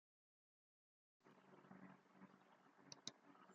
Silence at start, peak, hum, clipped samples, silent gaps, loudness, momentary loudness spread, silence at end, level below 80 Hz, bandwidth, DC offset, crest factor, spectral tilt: 1.2 s; -32 dBFS; none; under 0.1%; none; -62 LUFS; 12 LU; 0 s; under -90 dBFS; 7.2 kHz; under 0.1%; 36 dB; -2.5 dB/octave